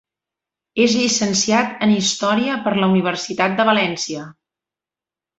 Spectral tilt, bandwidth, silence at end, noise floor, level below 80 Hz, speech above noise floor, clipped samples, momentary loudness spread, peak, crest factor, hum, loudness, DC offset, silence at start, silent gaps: -3.5 dB/octave; 8 kHz; 1.05 s; -89 dBFS; -60 dBFS; 72 dB; under 0.1%; 7 LU; -2 dBFS; 18 dB; none; -18 LUFS; under 0.1%; 0.75 s; none